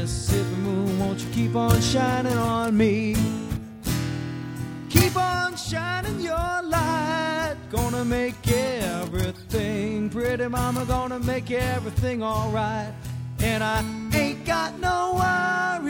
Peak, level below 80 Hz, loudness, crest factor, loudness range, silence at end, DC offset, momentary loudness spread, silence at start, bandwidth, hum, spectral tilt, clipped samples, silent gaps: -2 dBFS; -38 dBFS; -25 LUFS; 22 dB; 3 LU; 0 s; under 0.1%; 7 LU; 0 s; over 20 kHz; none; -5.5 dB/octave; under 0.1%; none